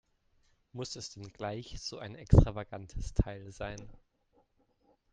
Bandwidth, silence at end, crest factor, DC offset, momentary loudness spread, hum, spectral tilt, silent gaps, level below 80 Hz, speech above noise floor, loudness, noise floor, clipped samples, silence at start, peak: 9.2 kHz; 1.2 s; 28 dB; under 0.1%; 19 LU; none; -6.5 dB/octave; none; -40 dBFS; 40 dB; -34 LUFS; -72 dBFS; under 0.1%; 0.75 s; -6 dBFS